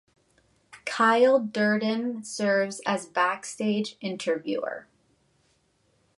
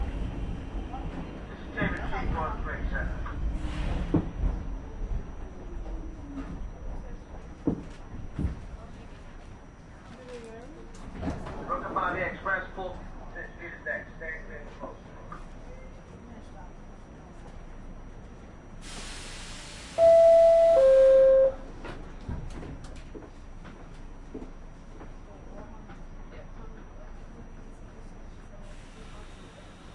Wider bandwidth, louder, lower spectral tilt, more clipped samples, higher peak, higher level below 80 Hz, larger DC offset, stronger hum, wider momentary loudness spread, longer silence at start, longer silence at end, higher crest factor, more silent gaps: about the same, 11.5 kHz vs 11 kHz; about the same, -26 LUFS vs -26 LUFS; second, -4.5 dB/octave vs -6.5 dB/octave; neither; about the same, -10 dBFS vs -12 dBFS; second, -76 dBFS vs -40 dBFS; neither; neither; second, 12 LU vs 26 LU; first, 0.75 s vs 0 s; first, 1.35 s vs 0 s; about the same, 18 dB vs 18 dB; neither